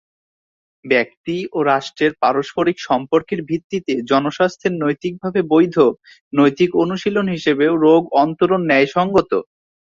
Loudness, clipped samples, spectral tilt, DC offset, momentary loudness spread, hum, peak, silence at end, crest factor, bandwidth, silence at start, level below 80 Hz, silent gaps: -17 LUFS; under 0.1%; -6.5 dB/octave; under 0.1%; 9 LU; none; -2 dBFS; 0.4 s; 16 dB; 7.4 kHz; 0.85 s; -56 dBFS; 1.17-1.24 s, 3.64-3.70 s, 6.21-6.31 s